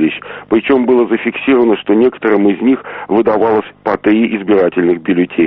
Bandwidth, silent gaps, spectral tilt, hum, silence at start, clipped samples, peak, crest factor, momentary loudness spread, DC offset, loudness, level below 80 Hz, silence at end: 4.3 kHz; none; -5 dB/octave; none; 0 s; under 0.1%; 0 dBFS; 12 dB; 5 LU; under 0.1%; -13 LUFS; -50 dBFS; 0 s